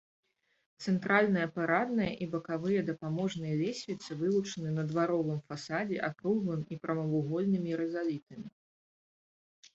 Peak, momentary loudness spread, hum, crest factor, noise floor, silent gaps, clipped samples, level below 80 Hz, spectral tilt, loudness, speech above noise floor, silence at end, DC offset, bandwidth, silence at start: -12 dBFS; 8 LU; none; 22 dB; under -90 dBFS; 8.23-8.27 s; under 0.1%; -70 dBFS; -6.5 dB/octave; -33 LUFS; over 58 dB; 1.25 s; under 0.1%; 8 kHz; 0.8 s